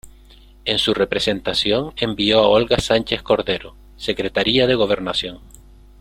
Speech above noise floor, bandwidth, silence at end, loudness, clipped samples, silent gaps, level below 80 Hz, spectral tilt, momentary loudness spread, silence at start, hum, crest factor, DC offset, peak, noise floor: 27 dB; 16 kHz; 0.6 s; -18 LUFS; under 0.1%; none; -42 dBFS; -4.5 dB/octave; 10 LU; 0.05 s; none; 18 dB; under 0.1%; -2 dBFS; -46 dBFS